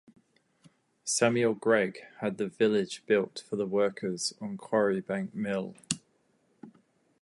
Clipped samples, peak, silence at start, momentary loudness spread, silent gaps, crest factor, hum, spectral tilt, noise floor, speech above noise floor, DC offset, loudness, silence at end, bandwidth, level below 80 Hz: under 0.1%; -6 dBFS; 1.05 s; 10 LU; none; 24 dB; none; -4 dB/octave; -70 dBFS; 41 dB; under 0.1%; -30 LUFS; 0.55 s; 11.5 kHz; -74 dBFS